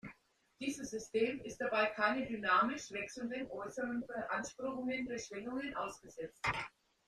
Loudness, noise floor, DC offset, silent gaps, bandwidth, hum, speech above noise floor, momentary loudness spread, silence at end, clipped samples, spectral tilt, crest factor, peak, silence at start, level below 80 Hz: -38 LUFS; -67 dBFS; under 0.1%; none; 13.5 kHz; none; 29 dB; 11 LU; 0.4 s; under 0.1%; -4 dB/octave; 20 dB; -20 dBFS; 0.05 s; -68 dBFS